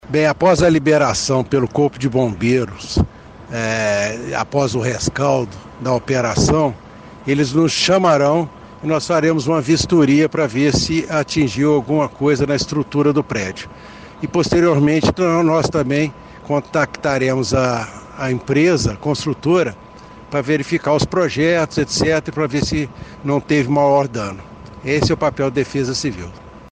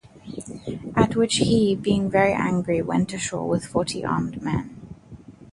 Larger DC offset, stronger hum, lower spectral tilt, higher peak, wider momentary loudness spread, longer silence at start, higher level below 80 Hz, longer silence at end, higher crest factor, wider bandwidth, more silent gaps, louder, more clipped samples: neither; neither; about the same, -5.5 dB/octave vs -5.5 dB/octave; about the same, -2 dBFS vs -4 dBFS; second, 11 LU vs 18 LU; about the same, 0.05 s vs 0.15 s; first, -40 dBFS vs -46 dBFS; about the same, 0.05 s vs 0.1 s; about the same, 16 dB vs 20 dB; second, 9.6 kHz vs 11.5 kHz; neither; first, -17 LUFS vs -23 LUFS; neither